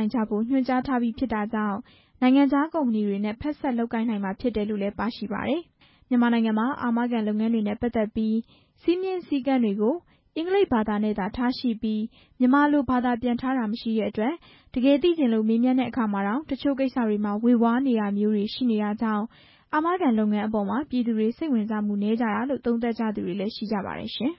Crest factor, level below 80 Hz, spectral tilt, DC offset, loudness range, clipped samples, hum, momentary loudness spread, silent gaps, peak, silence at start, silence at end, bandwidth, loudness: 16 dB; -54 dBFS; -11 dB/octave; under 0.1%; 3 LU; under 0.1%; none; 8 LU; none; -10 dBFS; 0 s; 0.05 s; 5.8 kHz; -25 LUFS